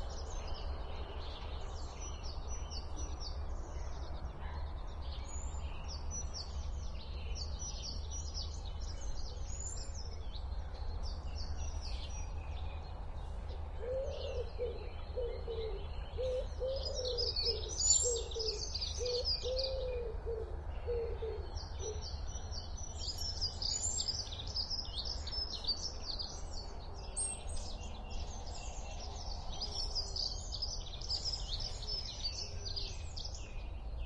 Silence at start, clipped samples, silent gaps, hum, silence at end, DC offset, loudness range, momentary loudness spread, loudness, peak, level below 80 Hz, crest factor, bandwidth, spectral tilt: 0 s; under 0.1%; none; none; 0 s; under 0.1%; 10 LU; 11 LU; -40 LUFS; -18 dBFS; -44 dBFS; 22 dB; 11 kHz; -2.5 dB/octave